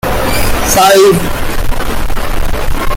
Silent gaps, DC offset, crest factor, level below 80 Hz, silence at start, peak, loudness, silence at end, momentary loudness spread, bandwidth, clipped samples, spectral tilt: none; under 0.1%; 8 dB; -16 dBFS; 0.05 s; 0 dBFS; -11 LUFS; 0 s; 12 LU; 17 kHz; under 0.1%; -4 dB/octave